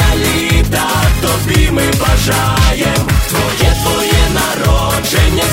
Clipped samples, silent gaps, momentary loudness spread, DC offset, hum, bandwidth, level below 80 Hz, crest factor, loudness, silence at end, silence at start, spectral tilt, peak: under 0.1%; none; 2 LU; under 0.1%; none; 16.5 kHz; -16 dBFS; 12 dB; -12 LUFS; 0 s; 0 s; -4 dB/octave; 0 dBFS